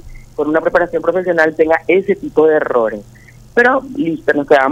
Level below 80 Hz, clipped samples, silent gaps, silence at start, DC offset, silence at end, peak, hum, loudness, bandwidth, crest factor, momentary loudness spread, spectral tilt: -44 dBFS; under 0.1%; none; 0.05 s; under 0.1%; 0 s; 0 dBFS; 50 Hz at -50 dBFS; -14 LUFS; 9 kHz; 14 dB; 8 LU; -6.5 dB/octave